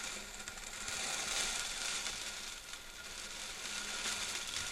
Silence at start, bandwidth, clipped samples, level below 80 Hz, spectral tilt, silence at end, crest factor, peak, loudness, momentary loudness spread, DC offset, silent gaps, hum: 0 s; 16 kHz; under 0.1%; -58 dBFS; 0.5 dB/octave; 0 s; 22 dB; -20 dBFS; -39 LUFS; 10 LU; under 0.1%; none; none